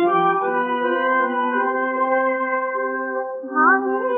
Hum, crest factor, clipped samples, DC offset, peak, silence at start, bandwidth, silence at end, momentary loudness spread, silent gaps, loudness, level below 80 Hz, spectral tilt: none; 16 dB; under 0.1%; under 0.1%; -4 dBFS; 0 s; 3.7 kHz; 0 s; 8 LU; none; -20 LUFS; -84 dBFS; -9.5 dB/octave